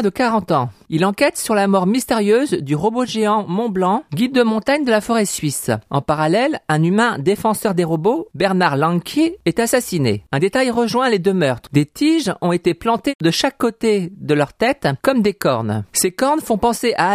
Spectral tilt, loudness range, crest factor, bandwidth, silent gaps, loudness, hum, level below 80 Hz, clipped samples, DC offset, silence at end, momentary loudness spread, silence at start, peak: -5 dB/octave; 1 LU; 16 dB; 15.5 kHz; 13.15-13.19 s; -17 LUFS; none; -50 dBFS; under 0.1%; under 0.1%; 0 s; 4 LU; 0 s; -2 dBFS